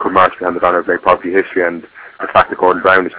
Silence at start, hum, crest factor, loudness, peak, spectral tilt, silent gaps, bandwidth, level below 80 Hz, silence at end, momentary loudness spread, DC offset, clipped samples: 0 s; none; 14 dB; -13 LUFS; 0 dBFS; -8.5 dB/octave; none; 4 kHz; -46 dBFS; 0 s; 6 LU; under 0.1%; 0.3%